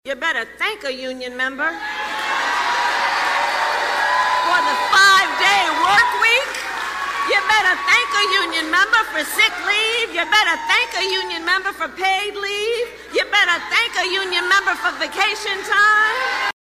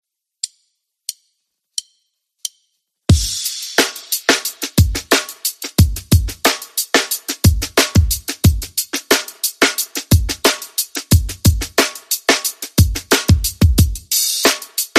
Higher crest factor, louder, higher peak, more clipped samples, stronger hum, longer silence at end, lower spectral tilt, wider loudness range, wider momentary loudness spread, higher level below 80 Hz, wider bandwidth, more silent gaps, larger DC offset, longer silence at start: about the same, 16 dB vs 18 dB; about the same, -17 LUFS vs -16 LUFS; about the same, -2 dBFS vs 0 dBFS; neither; neither; first, 0.15 s vs 0 s; second, 0 dB/octave vs -3.5 dB/octave; about the same, 4 LU vs 5 LU; second, 9 LU vs 13 LU; second, -56 dBFS vs -26 dBFS; about the same, 15.5 kHz vs 15.5 kHz; neither; neither; second, 0.05 s vs 0.45 s